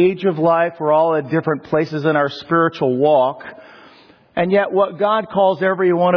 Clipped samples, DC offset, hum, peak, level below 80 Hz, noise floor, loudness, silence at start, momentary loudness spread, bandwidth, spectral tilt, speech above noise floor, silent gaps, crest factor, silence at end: under 0.1%; under 0.1%; none; -4 dBFS; -62 dBFS; -47 dBFS; -17 LUFS; 0 s; 5 LU; 5.4 kHz; -8.5 dB/octave; 31 dB; none; 12 dB; 0 s